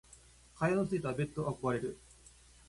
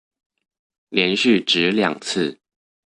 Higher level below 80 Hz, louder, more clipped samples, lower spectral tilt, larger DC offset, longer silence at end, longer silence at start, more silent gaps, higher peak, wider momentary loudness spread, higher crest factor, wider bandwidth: about the same, -62 dBFS vs -62 dBFS; second, -35 LUFS vs -19 LUFS; neither; first, -7 dB/octave vs -4 dB/octave; neither; first, 0.7 s vs 0.55 s; second, 0.1 s vs 0.9 s; neither; second, -18 dBFS vs -2 dBFS; about the same, 8 LU vs 8 LU; about the same, 18 dB vs 20 dB; about the same, 11.5 kHz vs 11.5 kHz